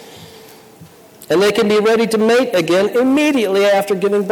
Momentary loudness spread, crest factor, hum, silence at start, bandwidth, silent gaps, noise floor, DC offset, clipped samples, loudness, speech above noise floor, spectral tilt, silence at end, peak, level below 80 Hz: 2 LU; 10 dB; none; 0 s; 19 kHz; none; -42 dBFS; under 0.1%; under 0.1%; -14 LUFS; 28 dB; -4.5 dB/octave; 0 s; -6 dBFS; -58 dBFS